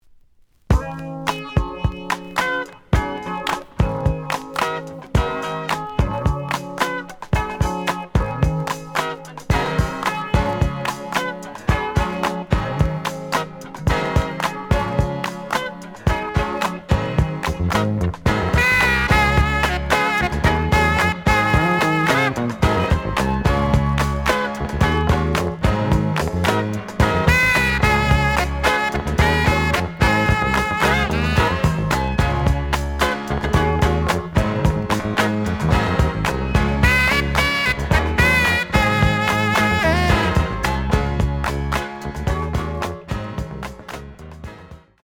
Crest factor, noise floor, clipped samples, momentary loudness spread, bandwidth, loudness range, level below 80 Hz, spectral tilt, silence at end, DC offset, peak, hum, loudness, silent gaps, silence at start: 18 dB; -53 dBFS; under 0.1%; 9 LU; 18.5 kHz; 6 LU; -28 dBFS; -5.5 dB/octave; 0.25 s; under 0.1%; 0 dBFS; none; -19 LUFS; none; 0.7 s